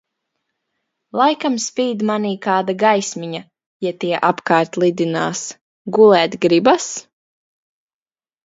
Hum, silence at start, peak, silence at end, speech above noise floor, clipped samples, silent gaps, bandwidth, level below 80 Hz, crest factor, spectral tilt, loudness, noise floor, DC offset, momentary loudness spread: none; 1.15 s; 0 dBFS; 1.45 s; over 74 dB; under 0.1%; 3.66-3.80 s, 5.61-5.85 s; 7.8 kHz; -66 dBFS; 18 dB; -4.5 dB/octave; -17 LUFS; under -90 dBFS; under 0.1%; 14 LU